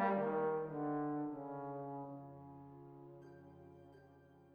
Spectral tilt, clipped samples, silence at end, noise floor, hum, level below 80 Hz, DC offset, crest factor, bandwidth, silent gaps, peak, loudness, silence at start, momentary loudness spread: -10 dB/octave; under 0.1%; 0 s; -64 dBFS; none; -78 dBFS; under 0.1%; 18 dB; 5 kHz; none; -24 dBFS; -41 LUFS; 0 s; 22 LU